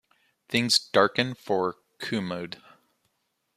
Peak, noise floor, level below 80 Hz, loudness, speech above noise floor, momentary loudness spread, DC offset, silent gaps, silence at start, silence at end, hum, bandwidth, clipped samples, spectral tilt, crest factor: -4 dBFS; -76 dBFS; -70 dBFS; -26 LUFS; 50 dB; 16 LU; under 0.1%; none; 0.5 s; 1.05 s; none; 15 kHz; under 0.1%; -3.5 dB/octave; 24 dB